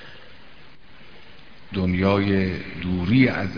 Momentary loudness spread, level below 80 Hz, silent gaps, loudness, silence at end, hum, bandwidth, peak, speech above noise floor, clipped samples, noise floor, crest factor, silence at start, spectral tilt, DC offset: 12 LU; -48 dBFS; none; -22 LUFS; 0 s; none; 5.4 kHz; -4 dBFS; 28 dB; under 0.1%; -49 dBFS; 20 dB; 0 s; -8.5 dB/octave; 0.9%